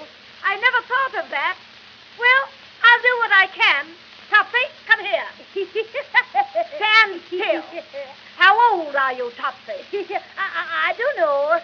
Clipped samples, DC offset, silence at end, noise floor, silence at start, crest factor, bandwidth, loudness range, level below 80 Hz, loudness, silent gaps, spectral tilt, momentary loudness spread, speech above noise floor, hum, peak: under 0.1%; under 0.1%; 0 s; -44 dBFS; 0 s; 20 dB; 5.4 kHz; 4 LU; -74 dBFS; -18 LUFS; none; -2 dB/octave; 16 LU; 24 dB; none; 0 dBFS